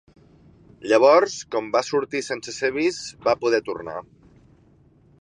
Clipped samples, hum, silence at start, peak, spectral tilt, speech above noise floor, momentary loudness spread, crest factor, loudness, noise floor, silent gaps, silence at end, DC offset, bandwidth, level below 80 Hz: under 0.1%; none; 0.8 s; -4 dBFS; -3.5 dB/octave; 34 dB; 16 LU; 20 dB; -22 LUFS; -56 dBFS; none; 1.2 s; under 0.1%; 10.5 kHz; -62 dBFS